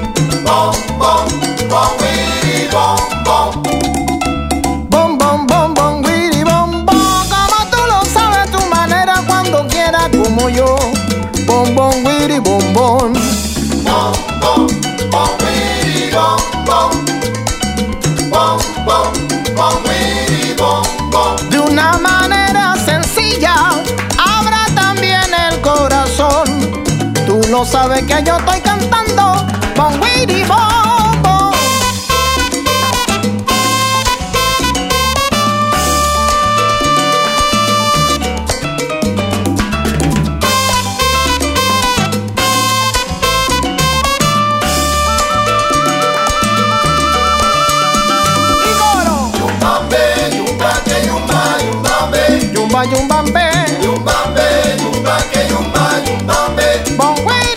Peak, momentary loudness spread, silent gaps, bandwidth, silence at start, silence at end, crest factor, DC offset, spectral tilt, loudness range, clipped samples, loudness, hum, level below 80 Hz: 0 dBFS; 4 LU; none; 16.5 kHz; 0 s; 0 s; 12 dB; under 0.1%; -3.5 dB/octave; 2 LU; under 0.1%; -12 LUFS; none; -26 dBFS